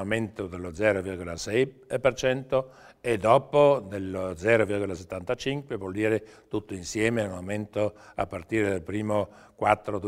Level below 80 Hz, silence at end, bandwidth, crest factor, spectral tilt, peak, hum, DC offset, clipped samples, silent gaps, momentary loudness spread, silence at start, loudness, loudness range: -54 dBFS; 0 s; 14.5 kHz; 22 dB; -5.5 dB/octave; -4 dBFS; none; under 0.1%; under 0.1%; none; 12 LU; 0 s; -27 LUFS; 5 LU